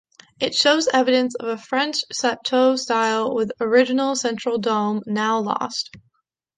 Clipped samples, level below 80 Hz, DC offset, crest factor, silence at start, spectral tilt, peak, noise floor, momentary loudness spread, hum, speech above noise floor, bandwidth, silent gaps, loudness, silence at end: under 0.1%; -68 dBFS; under 0.1%; 18 dB; 0.4 s; -3 dB/octave; -2 dBFS; -71 dBFS; 7 LU; none; 50 dB; 9.6 kHz; none; -20 LUFS; 0.6 s